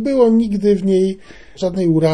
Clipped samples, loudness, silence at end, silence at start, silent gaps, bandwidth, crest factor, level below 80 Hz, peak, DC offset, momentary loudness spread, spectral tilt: under 0.1%; -16 LUFS; 0 s; 0 s; none; 11 kHz; 14 dB; -46 dBFS; -2 dBFS; 0.7%; 10 LU; -8 dB/octave